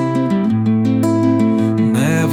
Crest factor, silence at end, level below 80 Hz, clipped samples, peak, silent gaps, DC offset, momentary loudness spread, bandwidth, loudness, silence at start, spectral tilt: 10 dB; 0 s; -54 dBFS; under 0.1%; -4 dBFS; none; under 0.1%; 2 LU; 15 kHz; -15 LUFS; 0 s; -7.5 dB/octave